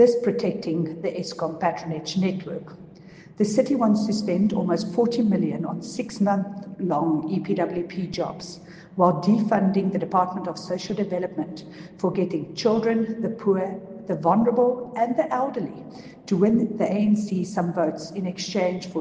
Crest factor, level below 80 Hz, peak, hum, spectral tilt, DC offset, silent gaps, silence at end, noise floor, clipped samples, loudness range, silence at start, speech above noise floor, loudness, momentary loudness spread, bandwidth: 20 dB; -62 dBFS; -4 dBFS; none; -7 dB/octave; under 0.1%; none; 0 s; -46 dBFS; under 0.1%; 3 LU; 0 s; 22 dB; -24 LUFS; 11 LU; 9.2 kHz